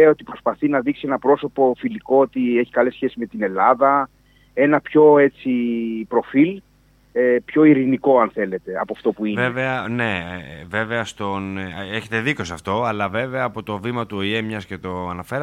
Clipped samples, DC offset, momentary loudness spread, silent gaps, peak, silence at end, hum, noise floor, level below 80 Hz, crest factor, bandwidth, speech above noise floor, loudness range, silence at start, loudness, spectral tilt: under 0.1%; under 0.1%; 12 LU; none; -2 dBFS; 0 s; 50 Hz at -55 dBFS; -50 dBFS; -56 dBFS; 18 dB; 11 kHz; 31 dB; 7 LU; 0 s; -20 LUFS; -7 dB/octave